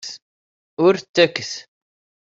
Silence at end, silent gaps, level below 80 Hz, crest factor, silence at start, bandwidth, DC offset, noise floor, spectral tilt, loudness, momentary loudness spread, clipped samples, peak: 0.7 s; 0.22-0.77 s, 1.09-1.14 s; -66 dBFS; 20 dB; 0.05 s; 7.8 kHz; under 0.1%; under -90 dBFS; -4 dB/octave; -18 LUFS; 20 LU; under 0.1%; -2 dBFS